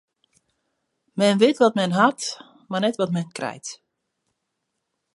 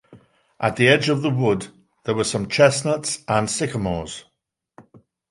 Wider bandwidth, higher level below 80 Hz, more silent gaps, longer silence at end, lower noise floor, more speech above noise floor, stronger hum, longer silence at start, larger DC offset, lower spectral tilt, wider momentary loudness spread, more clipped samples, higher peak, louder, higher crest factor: about the same, 11.5 kHz vs 11.5 kHz; second, -74 dBFS vs -50 dBFS; neither; first, 1.4 s vs 0.5 s; first, -78 dBFS vs -54 dBFS; first, 58 dB vs 34 dB; neither; first, 1.15 s vs 0.1 s; neither; about the same, -5 dB/octave vs -4.5 dB/octave; first, 18 LU vs 14 LU; neither; about the same, -4 dBFS vs -2 dBFS; about the same, -21 LUFS vs -20 LUFS; about the same, 20 dB vs 20 dB